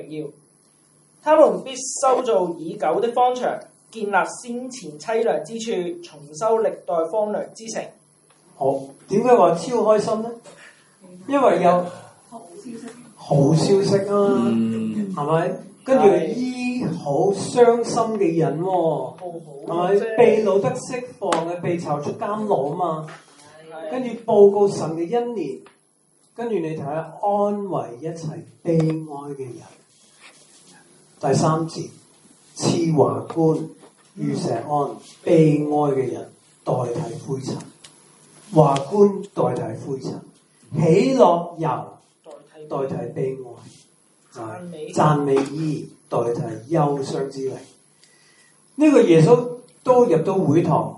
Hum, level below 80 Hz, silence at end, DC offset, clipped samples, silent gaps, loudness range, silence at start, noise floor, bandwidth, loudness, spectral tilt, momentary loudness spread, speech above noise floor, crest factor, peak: none; -66 dBFS; 0 s; under 0.1%; under 0.1%; none; 6 LU; 0 s; -61 dBFS; 11.5 kHz; -20 LUFS; -6.5 dB/octave; 18 LU; 41 dB; 20 dB; 0 dBFS